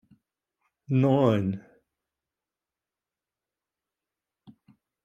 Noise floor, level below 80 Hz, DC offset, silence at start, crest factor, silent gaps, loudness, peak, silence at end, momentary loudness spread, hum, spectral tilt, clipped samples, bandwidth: under -90 dBFS; -72 dBFS; under 0.1%; 0.9 s; 22 dB; none; -25 LUFS; -8 dBFS; 3.45 s; 12 LU; none; -9.5 dB/octave; under 0.1%; 7.4 kHz